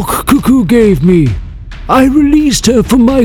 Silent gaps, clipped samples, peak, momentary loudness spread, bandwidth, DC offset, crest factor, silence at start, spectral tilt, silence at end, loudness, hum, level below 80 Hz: none; 2%; 0 dBFS; 9 LU; 19 kHz; under 0.1%; 8 dB; 0 s; -5.5 dB/octave; 0 s; -8 LUFS; none; -24 dBFS